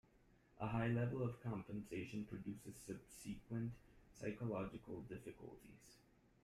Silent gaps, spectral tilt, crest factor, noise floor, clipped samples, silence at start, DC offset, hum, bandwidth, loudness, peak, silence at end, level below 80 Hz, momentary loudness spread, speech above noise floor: none; -7 dB/octave; 18 dB; -72 dBFS; under 0.1%; 0.55 s; under 0.1%; none; 14 kHz; -47 LUFS; -28 dBFS; 0.45 s; -68 dBFS; 19 LU; 26 dB